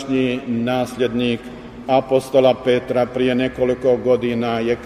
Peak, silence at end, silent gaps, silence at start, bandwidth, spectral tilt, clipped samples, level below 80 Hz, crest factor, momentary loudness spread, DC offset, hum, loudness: -2 dBFS; 0 s; none; 0 s; 14 kHz; -6.5 dB/octave; under 0.1%; -48 dBFS; 16 dB; 6 LU; under 0.1%; none; -19 LUFS